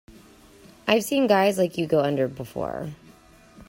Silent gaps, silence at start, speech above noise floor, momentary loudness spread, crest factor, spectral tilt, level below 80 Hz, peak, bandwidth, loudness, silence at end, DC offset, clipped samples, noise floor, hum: none; 0.1 s; 29 dB; 12 LU; 20 dB; -5 dB/octave; -58 dBFS; -6 dBFS; 16 kHz; -23 LUFS; 0.05 s; under 0.1%; under 0.1%; -52 dBFS; none